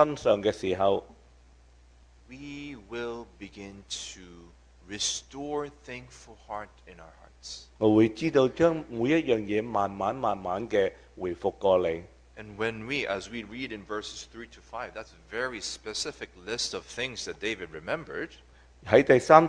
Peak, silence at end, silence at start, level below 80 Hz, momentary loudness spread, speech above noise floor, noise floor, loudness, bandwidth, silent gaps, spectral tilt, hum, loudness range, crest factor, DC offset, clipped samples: -2 dBFS; 0 s; 0 s; -56 dBFS; 19 LU; 28 dB; -56 dBFS; -29 LUFS; 10.5 kHz; none; -4.5 dB/octave; none; 10 LU; 28 dB; under 0.1%; under 0.1%